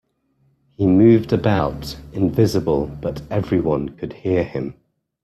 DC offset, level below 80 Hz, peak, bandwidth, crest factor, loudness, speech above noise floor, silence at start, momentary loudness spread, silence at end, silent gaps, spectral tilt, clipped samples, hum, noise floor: under 0.1%; -42 dBFS; -2 dBFS; 13.5 kHz; 16 dB; -19 LUFS; 45 dB; 0.8 s; 15 LU; 0.5 s; none; -8 dB/octave; under 0.1%; none; -63 dBFS